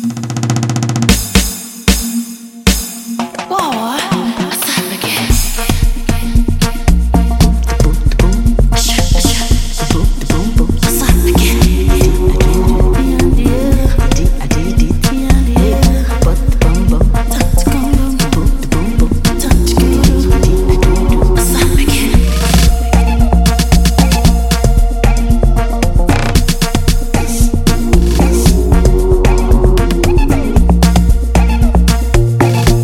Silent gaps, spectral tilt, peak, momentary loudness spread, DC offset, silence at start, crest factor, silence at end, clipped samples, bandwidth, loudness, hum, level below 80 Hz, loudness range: none; -5 dB/octave; 0 dBFS; 5 LU; under 0.1%; 0 s; 10 dB; 0 s; under 0.1%; 17 kHz; -12 LUFS; none; -12 dBFS; 3 LU